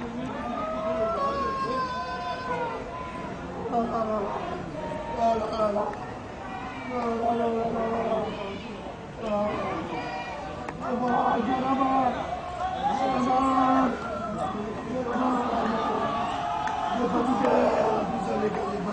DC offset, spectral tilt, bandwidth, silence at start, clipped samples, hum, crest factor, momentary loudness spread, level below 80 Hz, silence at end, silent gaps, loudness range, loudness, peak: under 0.1%; -6 dB/octave; 9.4 kHz; 0 s; under 0.1%; none; 16 dB; 11 LU; -50 dBFS; 0 s; none; 5 LU; -28 LUFS; -12 dBFS